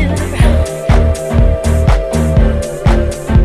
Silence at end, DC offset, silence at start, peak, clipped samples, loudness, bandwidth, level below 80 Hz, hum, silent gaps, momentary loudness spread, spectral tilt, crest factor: 0 s; under 0.1%; 0 s; 0 dBFS; under 0.1%; -13 LUFS; 13.5 kHz; -12 dBFS; none; none; 3 LU; -7 dB/octave; 10 dB